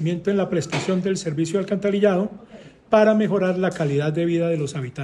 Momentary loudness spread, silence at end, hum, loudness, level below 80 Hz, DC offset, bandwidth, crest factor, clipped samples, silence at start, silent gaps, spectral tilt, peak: 7 LU; 0 s; none; -21 LUFS; -58 dBFS; under 0.1%; 11.5 kHz; 16 dB; under 0.1%; 0 s; none; -6.5 dB/octave; -4 dBFS